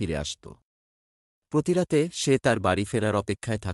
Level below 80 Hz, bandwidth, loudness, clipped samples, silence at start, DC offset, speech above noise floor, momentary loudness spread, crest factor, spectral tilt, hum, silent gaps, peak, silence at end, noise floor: -52 dBFS; 12 kHz; -26 LUFS; under 0.1%; 0 s; under 0.1%; over 65 dB; 8 LU; 18 dB; -5.5 dB/octave; none; 0.62-1.42 s; -8 dBFS; 0 s; under -90 dBFS